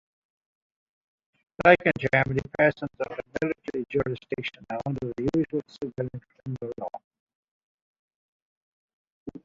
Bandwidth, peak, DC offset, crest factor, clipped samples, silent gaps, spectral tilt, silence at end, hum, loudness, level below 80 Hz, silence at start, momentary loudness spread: 7.6 kHz; -4 dBFS; under 0.1%; 26 dB; under 0.1%; 7.04-7.11 s, 7.20-7.27 s, 7.35-8.09 s, 8.15-9.26 s; -7.5 dB/octave; 0.05 s; none; -27 LUFS; -56 dBFS; 1.6 s; 16 LU